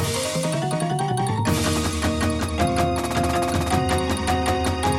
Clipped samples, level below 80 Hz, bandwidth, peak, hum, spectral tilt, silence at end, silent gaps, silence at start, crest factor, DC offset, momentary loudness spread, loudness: under 0.1%; -34 dBFS; 17 kHz; -8 dBFS; none; -5 dB/octave; 0 s; none; 0 s; 14 dB; under 0.1%; 2 LU; -22 LUFS